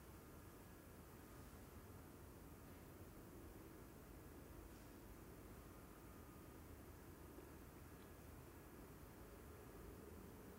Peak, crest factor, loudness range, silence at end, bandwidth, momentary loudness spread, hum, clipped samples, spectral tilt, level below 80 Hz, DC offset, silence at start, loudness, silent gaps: -46 dBFS; 14 dB; 0 LU; 0 s; 16 kHz; 2 LU; none; under 0.1%; -5.5 dB/octave; -66 dBFS; under 0.1%; 0 s; -61 LUFS; none